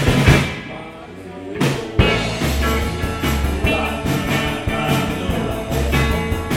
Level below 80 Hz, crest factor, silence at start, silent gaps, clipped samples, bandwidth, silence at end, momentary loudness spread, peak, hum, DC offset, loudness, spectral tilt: -26 dBFS; 18 dB; 0 s; none; under 0.1%; 16.5 kHz; 0 s; 14 LU; 0 dBFS; none; under 0.1%; -19 LUFS; -5.5 dB/octave